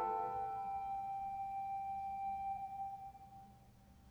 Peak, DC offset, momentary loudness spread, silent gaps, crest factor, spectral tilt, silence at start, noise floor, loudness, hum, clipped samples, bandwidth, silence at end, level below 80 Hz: -30 dBFS; under 0.1%; 15 LU; none; 14 dB; -6.5 dB/octave; 0 s; -63 dBFS; -43 LUFS; none; under 0.1%; 19.5 kHz; 0 s; -68 dBFS